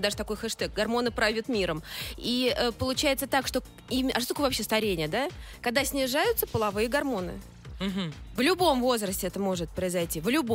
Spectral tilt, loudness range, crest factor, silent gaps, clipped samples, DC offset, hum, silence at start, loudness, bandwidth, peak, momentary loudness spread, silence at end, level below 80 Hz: -3.5 dB/octave; 1 LU; 20 dB; none; under 0.1%; under 0.1%; none; 0 s; -28 LUFS; 16 kHz; -10 dBFS; 8 LU; 0 s; -46 dBFS